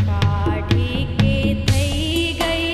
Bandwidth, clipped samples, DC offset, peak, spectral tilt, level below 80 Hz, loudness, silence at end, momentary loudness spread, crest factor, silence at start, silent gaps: 14 kHz; under 0.1%; under 0.1%; -2 dBFS; -5.5 dB/octave; -28 dBFS; -19 LUFS; 0 s; 2 LU; 16 dB; 0 s; none